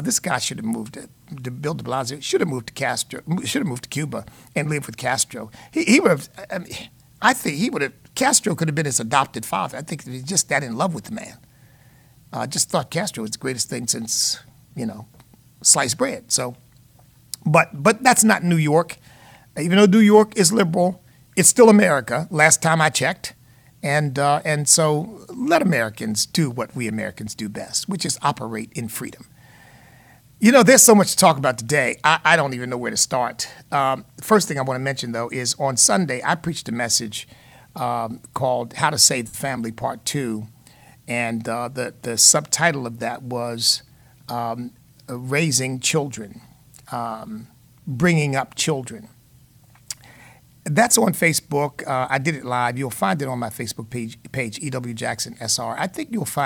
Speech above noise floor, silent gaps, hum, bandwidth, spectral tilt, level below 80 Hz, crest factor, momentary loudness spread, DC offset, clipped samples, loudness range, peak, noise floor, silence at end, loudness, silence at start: 32 dB; none; none; 19 kHz; -3.5 dB/octave; -58 dBFS; 20 dB; 17 LU; under 0.1%; under 0.1%; 9 LU; 0 dBFS; -52 dBFS; 0 s; -19 LUFS; 0 s